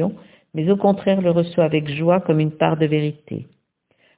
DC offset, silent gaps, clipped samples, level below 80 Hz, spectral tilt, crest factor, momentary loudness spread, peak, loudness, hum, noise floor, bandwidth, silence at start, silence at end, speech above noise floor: under 0.1%; none; under 0.1%; -58 dBFS; -11.5 dB/octave; 18 dB; 13 LU; -2 dBFS; -19 LUFS; none; -64 dBFS; 4 kHz; 0 s; 0.75 s; 45 dB